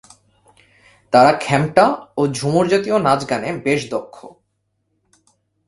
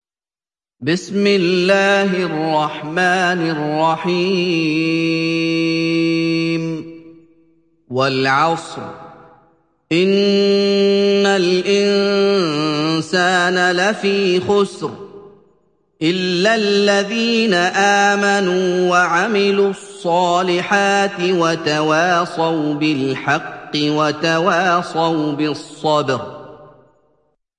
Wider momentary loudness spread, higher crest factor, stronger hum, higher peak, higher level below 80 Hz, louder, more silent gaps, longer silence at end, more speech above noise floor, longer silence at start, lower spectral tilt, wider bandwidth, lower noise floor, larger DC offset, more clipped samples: about the same, 8 LU vs 7 LU; about the same, 18 dB vs 16 dB; neither; about the same, 0 dBFS vs 0 dBFS; first, -54 dBFS vs -62 dBFS; about the same, -17 LUFS vs -16 LUFS; neither; first, 1.4 s vs 0.95 s; second, 54 dB vs over 74 dB; first, 1.1 s vs 0.8 s; about the same, -5.5 dB/octave vs -5 dB/octave; about the same, 11.5 kHz vs 10.5 kHz; second, -70 dBFS vs under -90 dBFS; neither; neither